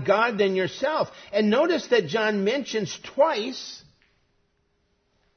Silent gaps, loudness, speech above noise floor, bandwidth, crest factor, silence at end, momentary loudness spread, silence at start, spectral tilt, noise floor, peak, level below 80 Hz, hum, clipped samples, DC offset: none; -24 LUFS; 46 dB; 6.6 kHz; 18 dB; 1.55 s; 10 LU; 0 s; -4.5 dB/octave; -70 dBFS; -8 dBFS; -68 dBFS; none; under 0.1%; under 0.1%